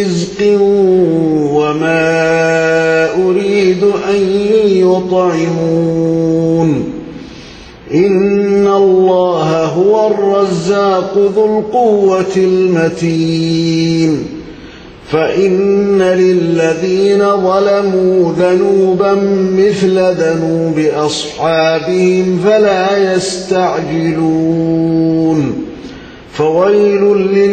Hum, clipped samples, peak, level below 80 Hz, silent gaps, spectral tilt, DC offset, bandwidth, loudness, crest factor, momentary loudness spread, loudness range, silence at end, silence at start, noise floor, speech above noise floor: none; under 0.1%; 0 dBFS; -44 dBFS; none; -6.5 dB/octave; under 0.1%; 9 kHz; -11 LUFS; 10 dB; 5 LU; 3 LU; 0 s; 0 s; -32 dBFS; 22 dB